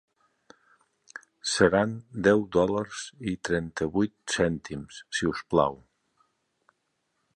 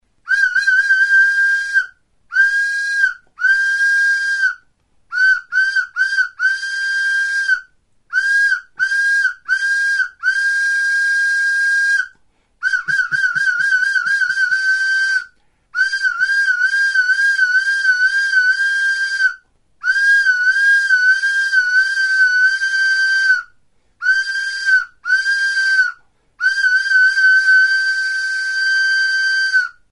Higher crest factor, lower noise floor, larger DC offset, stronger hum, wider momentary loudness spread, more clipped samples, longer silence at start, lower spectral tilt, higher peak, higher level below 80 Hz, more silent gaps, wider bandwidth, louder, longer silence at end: first, 22 dB vs 12 dB; first, -77 dBFS vs -57 dBFS; neither; neither; first, 14 LU vs 7 LU; neither; first, 1.45 s vs 0.25 s; first, -4.5 dB/octave vs 3.5 dB/octave; about the same, -6 dBFS vs -4 dBFS; first, -54 dBFS vs -64 dBFS; neither; about the same, 11.5 kHz vs 11.5 kHz; second, -27 LUFS vs -14 LUFS; first, 1.6 s vs 0.2 s